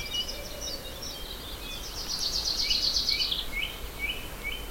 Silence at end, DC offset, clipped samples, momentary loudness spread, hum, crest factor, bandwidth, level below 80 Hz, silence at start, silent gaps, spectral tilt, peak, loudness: 0 s; under 0.1%; under 0.1%; 13 LU; none; 20 dB; 16.5 kHz; -42 dBFS; 0 s; none; -1 dB/octave; -12 dBFS; -30 LUFS